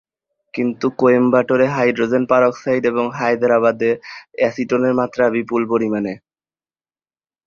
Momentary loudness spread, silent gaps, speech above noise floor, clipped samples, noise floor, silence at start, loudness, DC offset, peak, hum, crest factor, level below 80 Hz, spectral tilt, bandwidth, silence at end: 8 LU; none; over 73 dB; under 0.1%; under -90 dBFS; 0.55 s; -17 LUFS; under 0.1%; -2 dBFS; none; 16 dB; -60 dBFS; -7 dB/octave; 7 kHz; 1.3 s